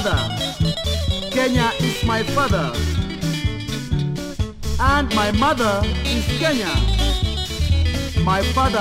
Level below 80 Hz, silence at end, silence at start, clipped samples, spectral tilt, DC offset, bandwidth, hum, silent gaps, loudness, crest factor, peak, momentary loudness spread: -26 dBFS; 0 s; 0 s; under 0.1%; -5 dB/octave; under 0.1%; 16 kHz; none; none; -20 LUFS; 16 dB; -4 dBFS; 6 LU